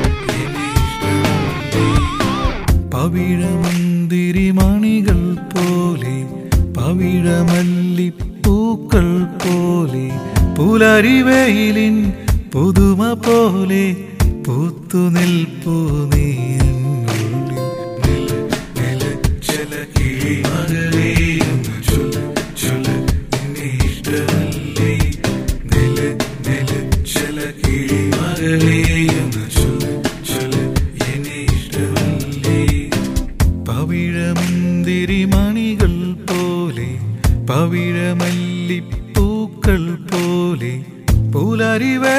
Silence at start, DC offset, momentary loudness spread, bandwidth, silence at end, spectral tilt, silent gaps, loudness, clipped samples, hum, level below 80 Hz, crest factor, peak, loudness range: 0 s; under 0.1%; 7 LU; 16 kHz; 0 s; -6 dB/octave; none; -16 LUFS; under 0.1%; none; -24 dBFS; 16 dB; 0 dBFS; 5 LU